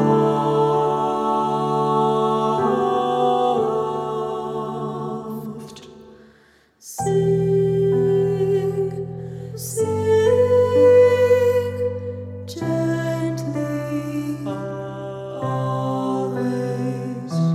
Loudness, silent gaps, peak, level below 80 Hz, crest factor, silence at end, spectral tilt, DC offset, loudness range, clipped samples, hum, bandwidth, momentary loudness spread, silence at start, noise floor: -20 LUFS; none; -6 dBFS; -58 dBFS; 16 dB; 0 s; -7 dB/octave; under 0.1%; 8 LU; under 0.1%; none; 15 kHz; 14 LU; 0 s; -55 dBFS